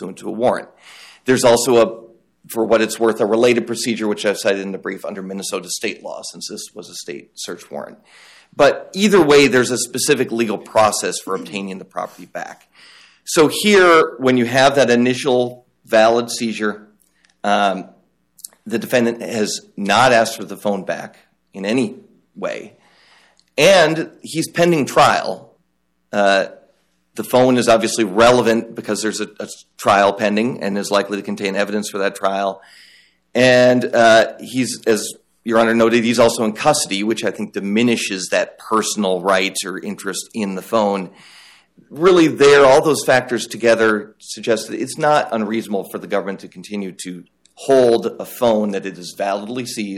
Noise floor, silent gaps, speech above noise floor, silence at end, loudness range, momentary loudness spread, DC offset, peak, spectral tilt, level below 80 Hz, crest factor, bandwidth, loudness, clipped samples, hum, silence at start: -68 dBFS; none; 51 dB; 0 s; 7 LU; 17 LU; under 0.1%; -2 dBFS; -4 dB/octave; -56 dBFS; 16 dB; 16 kHz; -16 LUFS; under 0.1%; none; 0 s